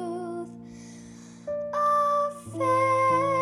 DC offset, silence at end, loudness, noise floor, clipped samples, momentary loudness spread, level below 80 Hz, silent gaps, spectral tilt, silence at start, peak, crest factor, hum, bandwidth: under 0.1%; 0 s; -25 LUFS; -45 dBFS; under 0.1%; 22 LU; -66 dBFS; none; -6 dB/octave; 0 s; -12 dBFS; 14 dB; none; 13 kHz